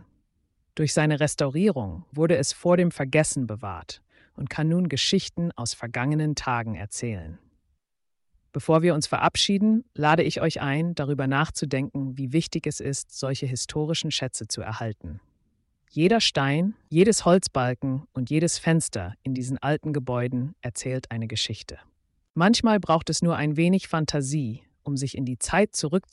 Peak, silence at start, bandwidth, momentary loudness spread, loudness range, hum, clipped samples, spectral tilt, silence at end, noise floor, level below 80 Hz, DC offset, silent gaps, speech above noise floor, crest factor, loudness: -8 dBFS; 0.75 s; 11.5 kHz; 12 LU; 5 LU; none; under 0.1%; -5 dB/octave; 0.1 s; -76 dBFS; -52 dBFS; under 0.1%; 22.30-22.34 s; 51 dB; 18 dB; -25 LUFS